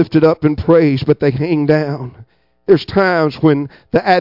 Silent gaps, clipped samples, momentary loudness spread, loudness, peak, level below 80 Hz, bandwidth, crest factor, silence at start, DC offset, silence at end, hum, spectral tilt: none; under 0.1%; 9 LU; -14 LUFS; 0 dBFS; -44 dBFS; 5.8 kHz; 14 dB; 0 s; under 0.1%; 0 s; none; -9 dB/octave